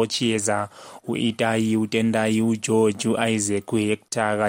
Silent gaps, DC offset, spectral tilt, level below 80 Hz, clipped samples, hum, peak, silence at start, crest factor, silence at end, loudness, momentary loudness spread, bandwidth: none; under 0.1%; -4.5 dB/octave; -62 dBFS; under 0.1%; none; -6 dBFS; 0 s; 16 dB; 0 s; -22 LUFS; 5 LU; 16.5 kHz